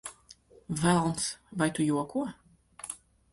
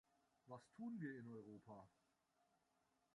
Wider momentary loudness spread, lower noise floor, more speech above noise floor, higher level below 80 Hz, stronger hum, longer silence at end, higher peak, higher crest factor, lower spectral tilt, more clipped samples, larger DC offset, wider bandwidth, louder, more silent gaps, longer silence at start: first, 17 LU vs 11 LU; second, -57 dBFS vs -85 dBFS; about the same, 28 dB vs 30 dB; first, -60 dBFS vs under -90 dBFS; neither; second, 0.35 s vs 1.25 s; first, -12 dBFS vs -40 dBFS; about the same, 20 dB vs 20 dB; second, -5 dB/octave vs -8 dB/octave; neither; neither; about the same, 12 kHz vs 11 kHz; first, -30 LUFS vs -56 LUFS; neither; second, 0.05 s vs 0.45 s